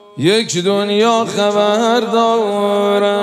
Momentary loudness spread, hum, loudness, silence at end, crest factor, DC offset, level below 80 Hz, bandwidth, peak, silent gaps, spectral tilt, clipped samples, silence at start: 2 LU; none; -14 LUFS; 0 s; 12 dB; under 0.1%; -72 dBFS; 14 kHz; -2 dBFS; none; -4.5 dB/octave; under 0.1%; 0.15 s